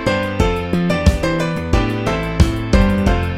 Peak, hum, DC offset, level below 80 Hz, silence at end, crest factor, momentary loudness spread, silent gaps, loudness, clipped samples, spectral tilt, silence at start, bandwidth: 0 dBFS; none; under 0.1%; -22 dBFS; 0 s; 16 dB; 4 LU; none; -17 LUFS; under 0.1%; -6.5 dB/octave; 0 s; 15.5 kHz